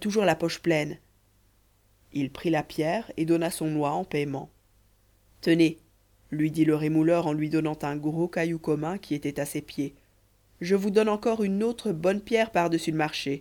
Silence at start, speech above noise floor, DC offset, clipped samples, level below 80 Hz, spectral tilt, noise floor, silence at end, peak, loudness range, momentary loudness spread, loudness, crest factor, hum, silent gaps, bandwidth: 0 s; 38 dB; under 0.1%; under 0.1%; -60 dBFS; -6 dB/octave; -64 dBFS; 0 s; -10 dBFS; 3 LU; 10 LU; -27 LUFS; 18 dB; none; none; 18.5 kHz